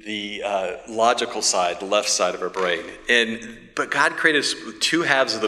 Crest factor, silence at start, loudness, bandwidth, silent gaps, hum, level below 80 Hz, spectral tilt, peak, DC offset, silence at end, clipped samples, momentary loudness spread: 22 dB; 0.05 s; -21 LUFS; 15.5 kHz; none; none; -60 dBFS; -1.5 dB/octave; 0 dBFS; under 0.1%; 0 s; under 0.1%; 9 LU